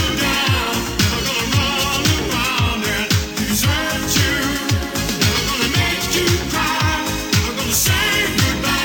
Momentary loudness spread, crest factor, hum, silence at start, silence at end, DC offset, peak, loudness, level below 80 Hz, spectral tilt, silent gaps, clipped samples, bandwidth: 3 LU; 16 dB; none; 0 s; 0 s; under 0.1%; -2 dBFS; -17 LUFS; -30 dBFS; -3 dB/octave; none; under 0.1%; 19 kHz